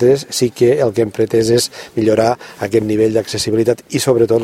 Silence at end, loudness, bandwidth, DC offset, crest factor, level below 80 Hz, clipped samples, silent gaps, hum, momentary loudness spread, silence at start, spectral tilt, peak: 0 s; -15 LUFS; 16 kHz; under 0.1%; 14 dB; -50 dBFS; under 0.1%; none; none; 5 LU; 0 s; -5 dB/octave; 0 dBFS